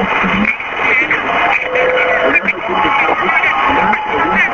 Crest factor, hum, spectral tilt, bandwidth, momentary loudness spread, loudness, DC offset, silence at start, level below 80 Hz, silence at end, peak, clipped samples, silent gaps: 14 dB; none; -5 dB/octave; 7.4 kHz; 3 LU; -12 LUFS; under 0.1%; 0 s; -40 dBFS; 0 s; 0 dBFS; under 0.1%; none